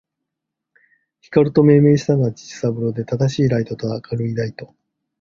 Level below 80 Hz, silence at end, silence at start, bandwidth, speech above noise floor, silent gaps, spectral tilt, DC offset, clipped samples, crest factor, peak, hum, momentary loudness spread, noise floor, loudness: -52 dBFS; 0.55 s; 1.3 s; 7.4 kHz; 64 dB; none; -8 dB/octave; under 0.1%; under 0.1%; 18 dB; -2 dBFS; none; 12 LU; -81 dBFS; -18 LUFS